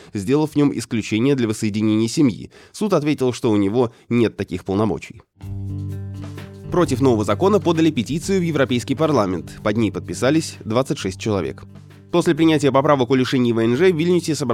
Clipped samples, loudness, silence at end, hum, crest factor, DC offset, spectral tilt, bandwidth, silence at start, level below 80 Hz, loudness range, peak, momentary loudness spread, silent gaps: under 0.1%; -19 LUFS; 0 s; none; 16 dB; under 0.1%; -6 dB/octave; 15 kHz; 0 s; -50 dBFS; 4 LU; -2 dBFS; 13 LU; none